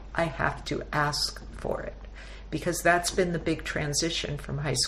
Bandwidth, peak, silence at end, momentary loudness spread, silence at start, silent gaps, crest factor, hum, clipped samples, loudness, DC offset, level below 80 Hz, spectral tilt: 15 kHz; -10 dBFS; 0 s; 13 LU; 0 s; none; 20 dB; none; under 0.1%; -28 LUFS; under 0.1%; -42 dBFS; -3.5 dB/octave